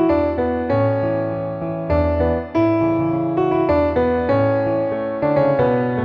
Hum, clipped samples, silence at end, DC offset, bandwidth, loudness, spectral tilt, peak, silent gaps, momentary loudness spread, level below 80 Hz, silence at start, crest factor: none; under 0.1%; 0 s; under 0.1%; 5.6 kHz; -19 LUFS; -10 dB/octave; -6 dBFS; none; 5 LU; -36 dBFS; 0 s; 12 dB